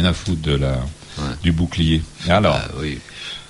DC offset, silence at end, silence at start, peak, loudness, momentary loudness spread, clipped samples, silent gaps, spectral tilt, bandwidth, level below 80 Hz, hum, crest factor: under 0.1%; 0 s; 0 s; -2 dBFS; -20 LUFS; 12 LU; under 0.1%; none; -6 dB/octave; 11.5 kHz; -30 dBFS; none; 18 dB